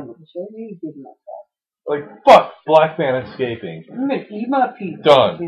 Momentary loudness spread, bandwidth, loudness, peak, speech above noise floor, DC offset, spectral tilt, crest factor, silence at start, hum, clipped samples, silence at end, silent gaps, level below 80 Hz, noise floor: 22 LU; 11 kHz; -16 LUFS; 0 dBFS; 28 dB; under 0.1%; -6 dB/octave; 18 dB; 0 s; none; under 0.1%; 0 s; none; -56 dBFS; -45 dBFS